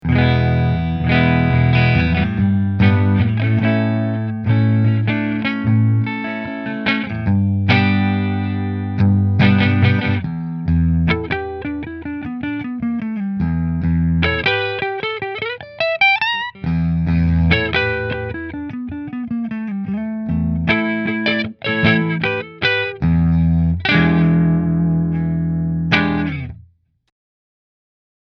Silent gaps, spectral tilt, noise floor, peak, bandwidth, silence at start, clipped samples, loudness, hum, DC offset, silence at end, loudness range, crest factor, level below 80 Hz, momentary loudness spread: none; -8.5 dB/octave; -50 dBFS; 0 dBFS; 6 kHz; 0.05 s; under 0.1%; -17 LUFS; none; under 0.1%; 1.75 s; 5 LU; 16 dB; -32 dBFS; 10 LU